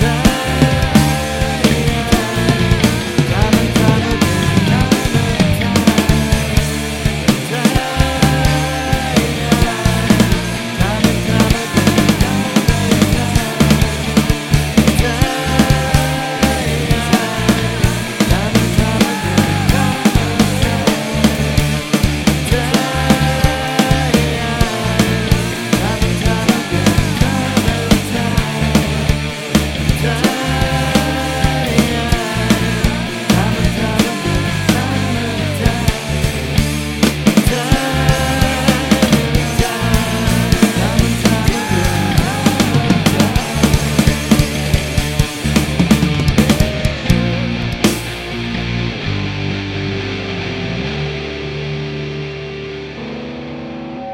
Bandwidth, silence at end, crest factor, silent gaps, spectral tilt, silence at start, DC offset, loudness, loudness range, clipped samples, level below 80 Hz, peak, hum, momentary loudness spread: 16.5 kHz; 0 s; 14 dB; none; -5 dB/octave; 0 s; under 0.1%; -15 LUFS; 3 LU; under 0.1%; -24 dBFS; 0 dBFS; none; 7 LU